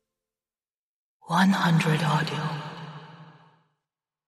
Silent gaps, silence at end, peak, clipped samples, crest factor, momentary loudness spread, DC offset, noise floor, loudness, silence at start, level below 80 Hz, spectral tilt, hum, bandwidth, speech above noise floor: none; 1.15 s; -8 dBFS; under 0.1%; 20 dB; 20 LU; under 0.1%; under -90 dBFS; -24 LUFS; 1.25 s; -70 dBFS; -6 dB/octave; none; 13 kHz; over 67 dB